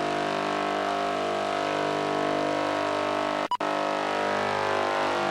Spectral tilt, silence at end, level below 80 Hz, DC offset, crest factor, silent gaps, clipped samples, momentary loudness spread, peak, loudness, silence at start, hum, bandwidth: -4 dB/octave; 0 s; -68 dBFS; under 0.1%; 12 dB; none; under 0.1%; 2 LU; -14 dBFS; -27 LUFS; 0 s; 50 Hz at -45 dBFS; 14 kHz